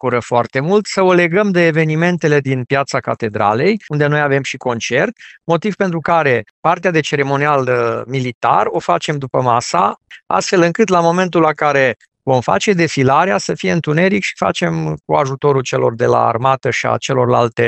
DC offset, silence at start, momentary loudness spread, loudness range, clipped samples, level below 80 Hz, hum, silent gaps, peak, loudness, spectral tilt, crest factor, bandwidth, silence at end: under 0.1%; 0.05 s; 5 LU; 2 LU; under 0.1%; -54 dBFS; none; 6.51-6.63 s, 8.35-8.41 s; 0 dBFS; -15 LUFS; -5.5 dB/octave; 14 dB; 8.6 kHz; 0 s